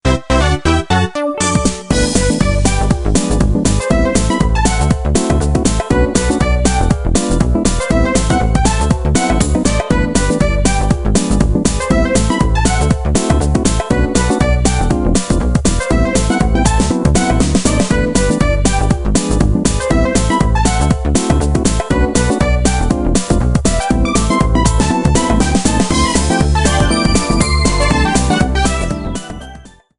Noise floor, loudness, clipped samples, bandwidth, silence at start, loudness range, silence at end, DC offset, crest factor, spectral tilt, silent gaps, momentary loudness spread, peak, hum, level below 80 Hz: -36 dBFS; -14 LUFS; under 0.1%; 11.5 kHz; 0.05 s; 1 LU; 0.3 s; under 0.1%; 12 dB; -5 dB/octave; none; 2 LU; 0 dBFS; none; -18 dBFS